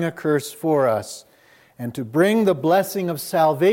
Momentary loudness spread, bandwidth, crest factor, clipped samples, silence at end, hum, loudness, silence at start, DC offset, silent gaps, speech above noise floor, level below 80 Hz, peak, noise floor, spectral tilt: 14 LU; 17 kHz; 16 dB; under 0.1%; 0 s; none; -20 LUFS; 0 s; under 0.1%; none; 34 dB; -70 dBFS; -6 dBFS; -54 dBFS; -6 dB/octave